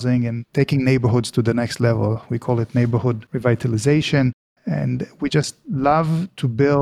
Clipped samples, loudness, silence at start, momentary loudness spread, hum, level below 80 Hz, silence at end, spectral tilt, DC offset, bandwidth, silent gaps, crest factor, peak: under 0.1%; -20 LUFS; 0 s; 7 LU; none; -48 dBFS; 0 s; -7 dB/octave; under 0.1%; 12.5 kHz; 4.33-4.56 s; 16 dB; -4 dBFS